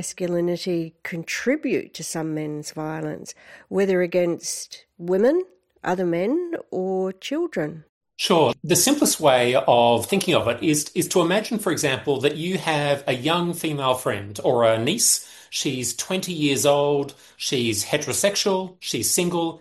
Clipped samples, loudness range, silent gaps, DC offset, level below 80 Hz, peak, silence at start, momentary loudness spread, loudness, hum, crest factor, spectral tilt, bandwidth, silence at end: under 0.1%; 7 LU; 7.89-8.01 s; under 0.1%; -64 dBFS; -4 dBFS; 0 s; 11 LU; -22 LUFS; none; 18 dB; -3.5 dB/octave; 16 kHz; 0 s